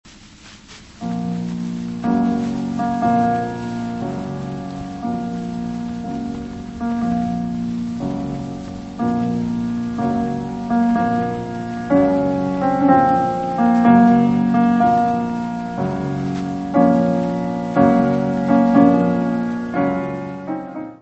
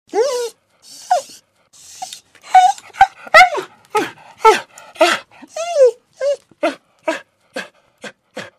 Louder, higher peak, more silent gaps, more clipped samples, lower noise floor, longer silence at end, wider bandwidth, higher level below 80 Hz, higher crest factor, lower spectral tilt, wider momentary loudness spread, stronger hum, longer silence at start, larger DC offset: second, -19 LUFS vs -15 LUFS; about the same, 0 dBFS vs 0 dBFS; neither; second, under 0.1% vs 0.1%; second, -42 dBFS vs -48 dBFS; about the same, 0.05 s vs 0.15 s; second, 8.2 kHz vs 15.5 kHz; first, -46 dBFS vs -54 dBFS; about the same, 18 dB vs 18 dB; first, -8 dB/octave vs -1.5 dB/octave; second, 13 LU vs 22 LU; neither; about the same, 0.05 s vs 0.15 s; neither